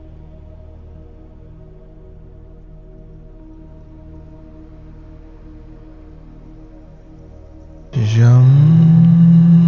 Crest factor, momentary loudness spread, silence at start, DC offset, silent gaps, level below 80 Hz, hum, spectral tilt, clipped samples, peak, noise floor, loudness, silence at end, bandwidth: 14 dB; 10 LU; 7.95 s; under 0.1%; none; -40 dBFS; none; -9.5 dB/octave; under 0.1%; -2 dBFS; -38 dBFS; -10 LUFS; 0 s; 6.6 kHz